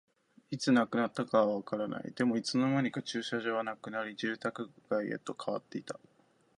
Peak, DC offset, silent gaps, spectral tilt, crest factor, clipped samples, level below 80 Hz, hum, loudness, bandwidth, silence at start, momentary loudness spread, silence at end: -14 dBFS; under 0.1%; none; -5.5 dB/octave; 20 dB; under 0.1%; -78 dBFS; none; -33 LUFS; 10.5 kHz; 0.5 s; 11 LU; 0.65 s